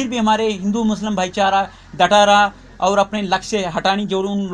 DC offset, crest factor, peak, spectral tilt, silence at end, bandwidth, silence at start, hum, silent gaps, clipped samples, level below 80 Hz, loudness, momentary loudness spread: under 0.1%; 16 dB; 0 dBFS; -4 dB/octave; 0 s; 10 kHz; 0 s; none; none; under 0.1%; -46 dBFS; -17 LUFS; 8 LU